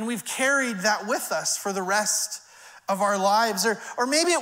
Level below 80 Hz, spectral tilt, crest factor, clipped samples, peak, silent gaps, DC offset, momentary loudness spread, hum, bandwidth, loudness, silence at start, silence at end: -78 dBFS; -2 dB/octave; 16 dB; under 0.1%; -8 dBFS; none; under 0.1%; 8 LU; none; 16 kHz; -24 LUFS; 0 s; 0 s